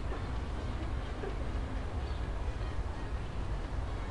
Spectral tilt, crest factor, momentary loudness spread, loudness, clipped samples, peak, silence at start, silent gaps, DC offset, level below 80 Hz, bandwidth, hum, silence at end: -7 dB/octave; 10 dB; 1 LU; -39 LUFS; under 0.1%; -24 dBFS; 0 s; none; 0.2%; -38 dBFS; 11 kHz; none; 0 s